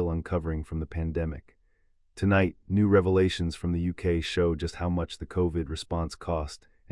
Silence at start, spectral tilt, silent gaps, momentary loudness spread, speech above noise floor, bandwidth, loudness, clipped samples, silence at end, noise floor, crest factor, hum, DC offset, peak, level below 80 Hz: 0 s; -7 dB/octave; none; 10 LU; 38 dB; 11.5 kHz; -28 LUFS; under 0.1%; 0.35 s; -65 dBFS; 18 dB; none; under 0.1%; -10 dBFS; -44 dBFS